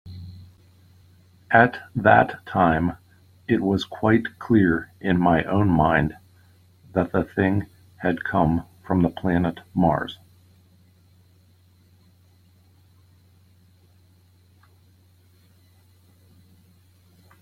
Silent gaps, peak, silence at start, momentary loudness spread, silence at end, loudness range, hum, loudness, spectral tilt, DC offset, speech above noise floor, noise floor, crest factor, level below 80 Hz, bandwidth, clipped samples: none; -2 dBFS; 0.05 s; 11 LU; 7.25 s; 6 LU; none; -22 LUFS; -8.5 dB/octave; under 0.1%; 36 dB; -57 dBFS; 22 dB; -50 dBFS; 13.5 kHz; under 0.1%